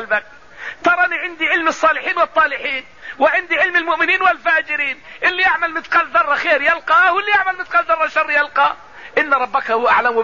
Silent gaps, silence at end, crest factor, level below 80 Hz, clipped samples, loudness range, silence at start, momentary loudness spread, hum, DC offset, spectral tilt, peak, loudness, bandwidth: none; 0 s; 14 dB; -56 dBFS; under 0.1%; 1 LU; 0 s; 7 LU; none; 0.5%; -2.5 dB/octave; -4 dBFS; -15 LUFS; 7.4 kHz